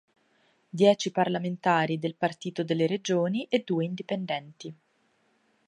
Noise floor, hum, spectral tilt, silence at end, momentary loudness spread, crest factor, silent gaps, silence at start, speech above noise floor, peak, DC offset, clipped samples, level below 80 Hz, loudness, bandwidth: -69 dBFS; none; -5.5 dB/octave; 0.95 s; 11 LU; 20 dB; none; 0.75 s; 42 dB; -8 dBFS; under 0.1%; under 0.1%; -78 dBFS; -27 LUFS; 11 kHz